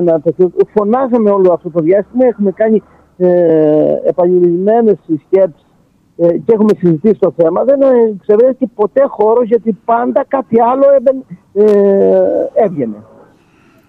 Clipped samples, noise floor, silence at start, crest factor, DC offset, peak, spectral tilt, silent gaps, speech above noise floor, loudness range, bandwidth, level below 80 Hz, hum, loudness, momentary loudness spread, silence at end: under 0.1%; -51 dBFS; 0 s; 10 dB; under 0.1%; 0 dBFS; -10.5 dB/octave; none; 41 dB; 1 LU; 4.9 kHz; -56 dBFS; none; -11 LUFS; 5 LU; 0.9 s